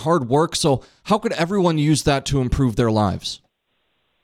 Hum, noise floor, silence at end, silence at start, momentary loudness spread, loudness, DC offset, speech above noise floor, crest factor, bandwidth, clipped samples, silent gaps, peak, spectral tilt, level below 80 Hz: none; -70 dBFS; 0.85 s; 0 s; 6 LU; -20 LUFS; under 0.1%; 51 dB; 16 dB; 15.5 kHz; under 0.1%; none; -4 dBFS; -5.5 dB/octave; -38 dBFS